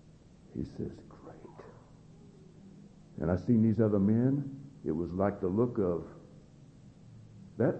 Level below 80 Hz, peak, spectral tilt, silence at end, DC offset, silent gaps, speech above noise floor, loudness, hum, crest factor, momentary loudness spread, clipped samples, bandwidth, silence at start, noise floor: -58 dBFS; -14 dBFS; -10.5 dB/octave; 0 s; under 0.1%; none; 27 dB; -31 LUFS; none; 20 dB; 24 LU; under 0.1%; 7.8 kHz; 0.55 s; -57 dBFS